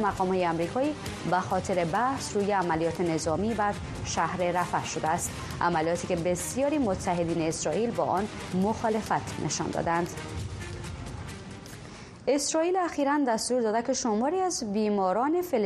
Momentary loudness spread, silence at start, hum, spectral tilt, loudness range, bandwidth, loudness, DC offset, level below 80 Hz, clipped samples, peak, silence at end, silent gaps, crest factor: 11 LU; 0 s; none; -4.5 dB/octave; 4 LU; 13 kHz; -28 LUFS; under 0.1%; -50 dBFS; under 0.1%; -12 dBFS; 0 s; none; 16 dB